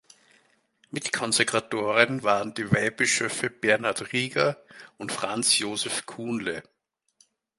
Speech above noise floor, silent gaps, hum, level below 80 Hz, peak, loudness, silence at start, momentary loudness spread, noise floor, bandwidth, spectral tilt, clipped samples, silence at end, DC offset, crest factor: 39 dB; none; none; -64 dBFS; -2 dBFS; -25 LUFS; 0.95 s; 11 LU; -66 dBFS; 12 kHz; -3 dB/octave; under 0.1%; 1 s; under 0.1%; 26 dB